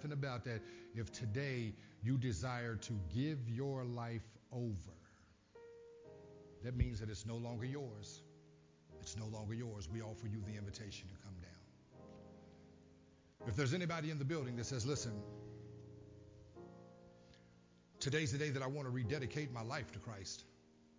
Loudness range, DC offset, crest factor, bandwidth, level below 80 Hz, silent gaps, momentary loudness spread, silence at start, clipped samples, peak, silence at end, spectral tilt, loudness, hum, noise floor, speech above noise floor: 6 LU; under 0.1%; 22 dB; 7.6 kHz; -58 dBFS; none; 21 LU; 0 s; under 0.1%; -22 dBFS; 0 s; -5.5 dB/octave; -44 LUFS; none; -68 dBFS; 26 dB